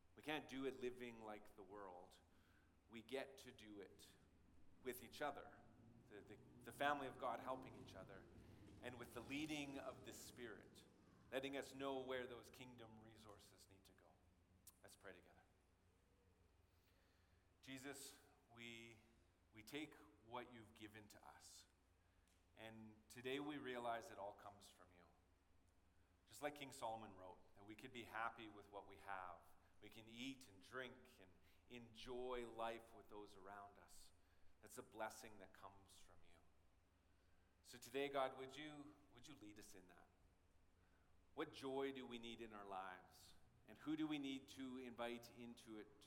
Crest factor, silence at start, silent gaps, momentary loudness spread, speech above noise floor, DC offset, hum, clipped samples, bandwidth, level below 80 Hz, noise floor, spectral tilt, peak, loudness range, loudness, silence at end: 28 dB; 0.05 s; none; 17 LU; 25 dB; under 0.1%; none; under 0.1%; 17.5 kHz; -78 dBFS; -79 dBFS; -4 dB/octave; -28 dBFS; 9 LU; -54 LUFS; 0 s